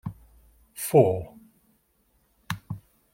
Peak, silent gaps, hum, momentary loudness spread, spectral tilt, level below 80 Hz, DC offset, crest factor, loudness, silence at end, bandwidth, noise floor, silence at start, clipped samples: -6 dBFS; none; none; 22 LU; -6.5 dB/octave; -58 dBFS; under 0.1%; 24 dB; -25 LUFS; 0.35 s; 16.5 kHz; -68 dBFS; 0.05 s; under 0.1%